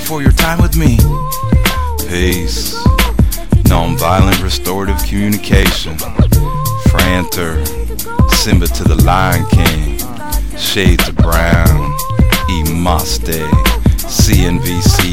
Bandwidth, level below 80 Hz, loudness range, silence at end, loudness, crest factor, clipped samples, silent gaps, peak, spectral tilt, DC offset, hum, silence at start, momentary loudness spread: 17 kHz; -16 dBFS; 1 LU; 0 s; -13 LUFS; 12 dB; 0.2%; none; 0 dBFS; -5 dB/octave; 7%; none; 0 s; 7 LU